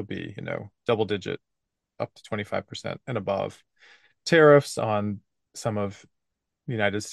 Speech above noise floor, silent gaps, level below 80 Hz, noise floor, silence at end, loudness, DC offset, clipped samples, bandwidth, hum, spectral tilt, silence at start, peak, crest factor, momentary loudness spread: 57 dB; none; -60 dBFS; -82 dBFS; 0 s; -26 LUFS; under 0.1%; under 0.1%; 12.5 kHz; none; -5.5 dB/octave; 0 s; -6 dBFS; 22 dB; 18 LU